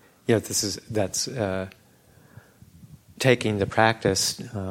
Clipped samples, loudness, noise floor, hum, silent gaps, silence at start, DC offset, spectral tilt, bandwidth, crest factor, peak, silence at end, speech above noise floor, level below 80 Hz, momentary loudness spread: under 0.1%; -24 LUFS; -56 dBFS; none; none; 0.3 s; under 0.1%; -4 dB/octave; 16.5 kHz; 24 dB; -2 dBFS; 0 s; 31 dB; -56 dBFS; 8 LU